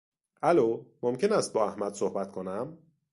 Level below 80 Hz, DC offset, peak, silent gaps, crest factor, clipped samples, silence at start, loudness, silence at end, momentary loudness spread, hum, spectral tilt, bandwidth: -70 dBFS; under 0.1%; -10 dBFS; none; 20 dB; under 0.1%; 0.4 s; -29 LUFS; 0.35 s; 11 LU; none; -5.5 dB/octave; 11.5 kHz